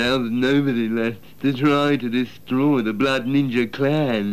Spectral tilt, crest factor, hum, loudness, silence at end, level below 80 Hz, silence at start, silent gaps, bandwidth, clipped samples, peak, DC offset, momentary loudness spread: -6.5 dB/octave; 12 dB; none; -21 LUFS; 0 s; -54 dBFS; 0 s; none; 14.5 kHz; under 0.1%; -8 dBFS; 0.7%; 6 LU